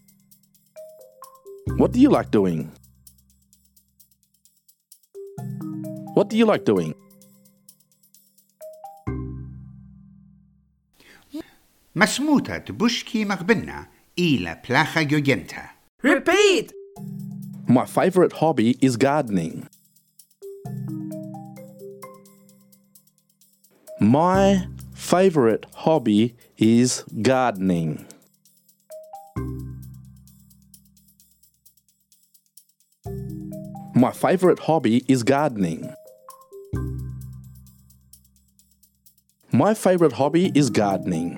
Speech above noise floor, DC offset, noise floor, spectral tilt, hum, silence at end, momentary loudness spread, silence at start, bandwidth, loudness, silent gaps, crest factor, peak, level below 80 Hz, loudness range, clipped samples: 43 dB; under 0.1%; -62 dBFS; -5.5 dB/octave; none; 0 s; 23 LU; 0.75 s; 18 kHz; -21 LUFS; 15.89-15.98 s; 22 dB; -2 dBFS; -48 dBFS; 19 LU; under 0.1%